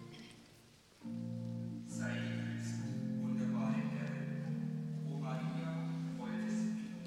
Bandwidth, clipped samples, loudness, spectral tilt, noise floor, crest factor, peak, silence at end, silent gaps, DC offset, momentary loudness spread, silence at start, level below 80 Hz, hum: 12 kHz; under 0.1%; -40 LUFS; -7 dB/octave; -63 dBFS; 14 dB; -26 dBFS; 0 s; none; under 0.1%; 8 LU; 0 s; -74 dBFS; none